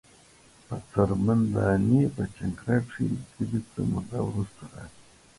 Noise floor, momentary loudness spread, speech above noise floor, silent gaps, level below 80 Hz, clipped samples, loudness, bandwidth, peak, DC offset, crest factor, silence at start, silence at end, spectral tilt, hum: -56 dBFS; 16 LU; 29 dB; none; -48 dBFS; under 0.1%; -27 LUFS; 11.5 kHz; -8 dBFS; under 0.1%; 20 dB; 0.7 s; 0.5 s; -8.5 dB/octave; none